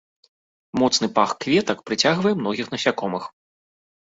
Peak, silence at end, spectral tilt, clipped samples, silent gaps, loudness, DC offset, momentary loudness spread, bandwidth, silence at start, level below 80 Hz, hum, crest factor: -2 dBFS; 0.75 s; -4 dB/octave; under 0.1%; none; -21 LUFS; under 0.1%; 10 LU; 8 kHz; 0.75 s; -62 dBFS; none; 20 dB